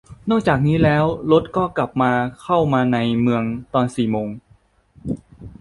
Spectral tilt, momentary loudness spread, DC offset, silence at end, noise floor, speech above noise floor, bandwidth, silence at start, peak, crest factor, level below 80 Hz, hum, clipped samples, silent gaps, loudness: -8 dB/octave; 13 LU; under 0.1%; 0.1 s; -55 dBFS; 37 dB; 11.5 kHz; 0.1 s; -2 dBFS; 16 dB; -44 dBFS; none; under 0.1%; none; -19 LUFS